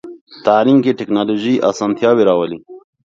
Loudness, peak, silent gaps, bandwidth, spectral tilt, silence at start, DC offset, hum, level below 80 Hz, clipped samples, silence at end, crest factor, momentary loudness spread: -14 LUFS; 0 dBFS; 0.21-0.27 s; 7.6 kHz; -6.5 dB/octave; 0.05 s; under 0.1%; none; -60 dBFS; under 0.1%; 0.3 s; 14 dB; 8 LU